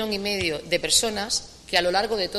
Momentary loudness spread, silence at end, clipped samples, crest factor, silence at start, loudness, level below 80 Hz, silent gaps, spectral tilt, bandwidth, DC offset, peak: 6 LU; 0 s; under 0.1%; 20 dB; 0 s; -23 LUFS; -48 dBFS; none; -1.5 dB/octave; 15 kHz; under 0.1%; -6 dBFS